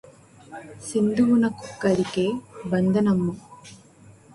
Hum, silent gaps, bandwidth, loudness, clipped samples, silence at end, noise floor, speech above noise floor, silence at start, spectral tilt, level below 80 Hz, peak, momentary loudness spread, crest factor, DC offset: none; none; 11.5 kHz; -23 LUFS; under 0.1%; 0.25 s; -51 dBFS; 28 dB; 0.5 s; -7 dB/octave; -58 dBFS; -8 dBFS; 21 LU; 16 dB; under 0.1%